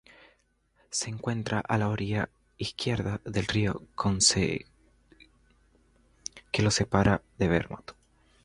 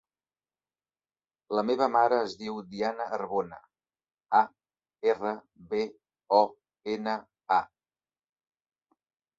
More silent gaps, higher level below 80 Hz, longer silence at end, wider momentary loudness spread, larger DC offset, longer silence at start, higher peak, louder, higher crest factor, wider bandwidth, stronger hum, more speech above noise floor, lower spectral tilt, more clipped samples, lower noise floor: neither; first, -48 dBFS vs -74 dBFS; second, 0.55 s vs 1.75 s; first, 15 LU vs 12 LU; neither; second, 0.9 s vs 1.5 s; about the same, -6 dBFS vs -8 dBFS; about the same, -28 LUFS vs -29 LUFS; about the same, 24 dB vs 24 dB; first, 11.5 kHz vs 7.8 kHz; neither; second, 41 dB vs over 62 dB; second, -4 dB/octave vs -5.5 dB/octave; neither; second, -69 dBFS vs under -90 dBFS